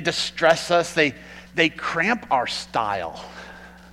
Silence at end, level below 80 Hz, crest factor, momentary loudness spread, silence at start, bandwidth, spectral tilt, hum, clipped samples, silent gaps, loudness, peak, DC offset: 0 s; -54 dBFS; 20 dB; 19 LU; 0 s; 15.5 kHz; -3.5 dB/octave; none; under 0.1%; none; -22 LUFS; -4 dBFS; under 0.1%